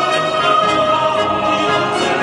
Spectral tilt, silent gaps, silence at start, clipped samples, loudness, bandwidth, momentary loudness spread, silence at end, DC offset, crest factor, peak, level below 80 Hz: -4 dB/octave; none; 0 s; under 0.1%; -15 LUFS; 11.5 kHz; 3 LU; 0 s; under 0.1%; 14 dB; -2 dBFS; -50 dBFS